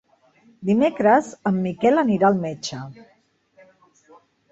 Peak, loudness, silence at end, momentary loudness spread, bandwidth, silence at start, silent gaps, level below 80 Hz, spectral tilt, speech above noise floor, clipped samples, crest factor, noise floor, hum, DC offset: -4 dBFS; -20 LUFS; 1.6 s; 13 LU; 8 kHz; 0.6 s; none; -64 dBFS; -6.5 dB/octave; 38 dB; under 0.1%; 18 dB; -58 dBFS; none; under 0.1%